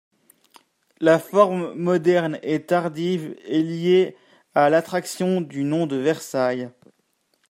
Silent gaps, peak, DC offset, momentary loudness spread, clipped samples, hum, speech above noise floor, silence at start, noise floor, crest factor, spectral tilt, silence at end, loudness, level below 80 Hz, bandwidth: none; -2 dBFS; under 0.1%; 8 LU; under 0.1%; none; 48 dB; 1 s; -69 dBFS; 20 dB; -6 dB/octave; 0.8 s; -22 LUFS; -72 dBFS; 15.5 kHz